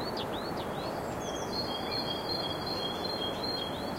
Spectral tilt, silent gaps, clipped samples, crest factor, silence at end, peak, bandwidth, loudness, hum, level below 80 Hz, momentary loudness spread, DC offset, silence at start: -4 dB/octave; none; under 0.1%; 14 dB; 0 s; -20 dBFS; 16 kHz; -34 LUFS; none; -54 dBFS; 3 LU; under 0.1%; 0 s